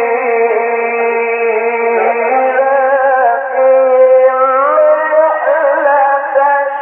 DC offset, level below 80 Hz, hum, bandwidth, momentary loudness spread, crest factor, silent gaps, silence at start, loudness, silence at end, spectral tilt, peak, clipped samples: under 0.1%; -88 dBFS; none; 3.3 kHz; 5 LU; 10 dB; none; 0 s; -11 LUFS; 0 s; -1 dB/octave; 0 dBFS; under 0.1%